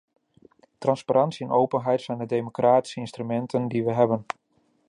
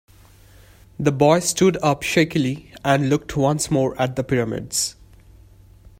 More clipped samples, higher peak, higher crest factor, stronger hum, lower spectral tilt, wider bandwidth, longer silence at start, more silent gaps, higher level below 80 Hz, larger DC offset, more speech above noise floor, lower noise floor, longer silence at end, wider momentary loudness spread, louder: neither; second, -6 dBFS vs -2 dBFS; about the same, 18 dB vs 20 dB; neither; first, -7 dB/octave vs -5 dB/octave; second, 11 kHz vs 16 kHz; second, 0.8 s vs 1 s; neither; second, -70 dBFS vs -48 dBFS; neither; first, 34 dB vs 29 dB; first, -57 dBFS vs -49 dBFS; second, 0.65 s vs 1.05 s; about the same, 9 LU vs 7 LU; second, -25 LUFS vs -20 LUFS